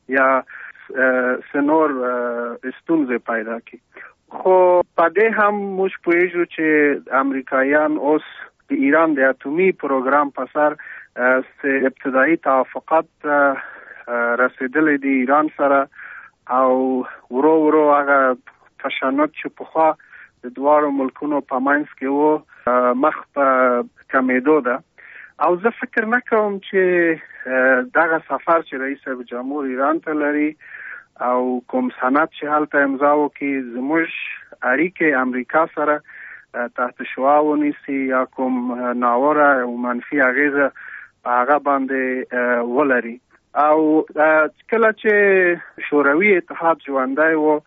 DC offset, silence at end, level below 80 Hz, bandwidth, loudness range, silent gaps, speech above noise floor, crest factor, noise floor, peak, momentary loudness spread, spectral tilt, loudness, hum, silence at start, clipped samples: under 0.1%; 0.1 s; -68 dBFS; 3.9 kHz; 4 LU; none; 24 dB; 14 dB; -42 dBFS; -4 dBFS; 11 LU; -4 dB/octave; -18 LUFS; none; 0.1 s; under 0.1%